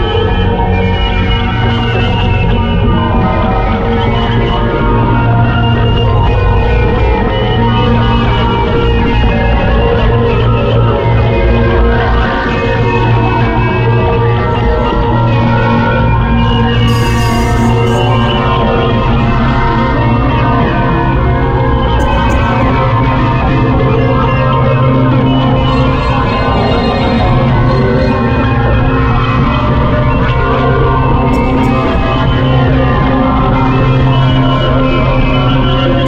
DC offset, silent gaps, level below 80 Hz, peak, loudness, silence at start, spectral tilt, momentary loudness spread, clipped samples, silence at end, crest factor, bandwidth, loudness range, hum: under 0.1%; none; -16 dBFS; 0 dBFS; -11 LUFS; 0 s; -7.5 dB/octave; 2 LU; under 0.1%; 0 s; 8 dB; 8.6 kHz; 1 LU; none